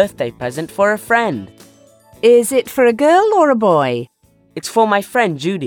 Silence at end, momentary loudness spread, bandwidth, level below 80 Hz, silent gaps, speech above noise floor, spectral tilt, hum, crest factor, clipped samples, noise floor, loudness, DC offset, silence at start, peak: 0 s; 13 LU; 18 kHz; -56 dBFS; none; 32 dB; -5 dB/octave; none; 14 dB; under 0.1%; -47 dBFS; -15 LUFS; under 0.1%; 0 s; 0 dBFS